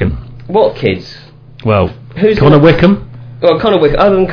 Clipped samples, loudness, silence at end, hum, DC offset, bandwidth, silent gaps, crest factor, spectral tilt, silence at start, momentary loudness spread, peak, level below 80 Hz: 2%; -10 LUFS; 0 s; none; under 0.1%; 5.4 kHz; none; 10 dB; -9 dB/octave; 0 s; 15 LU; 0 dBFS; -28 dBFS